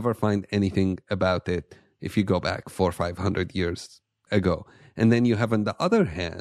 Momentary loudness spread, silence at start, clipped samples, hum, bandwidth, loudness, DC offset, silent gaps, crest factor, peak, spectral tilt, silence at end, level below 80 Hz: 9 LU; 0 s; under 0.1%; none; 13 kHz; -25 LUFS; under 0.1%; none; 18 dB; -8 dBFS; -7 dB/octave; 0 s; -50 dBFS